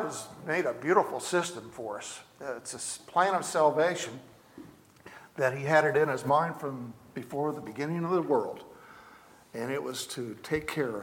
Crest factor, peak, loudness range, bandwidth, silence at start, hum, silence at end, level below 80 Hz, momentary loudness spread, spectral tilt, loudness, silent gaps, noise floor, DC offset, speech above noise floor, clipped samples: 22 dB; -8 dBFS; 5 LU; 17.5 kHz; 0 s; none; 0 s; -68 dBFS; 17 LU; -4.5 dB/octave; -30 LUFS; none; -55 dBFS; under 0.1%; 25 dB; under 0.1%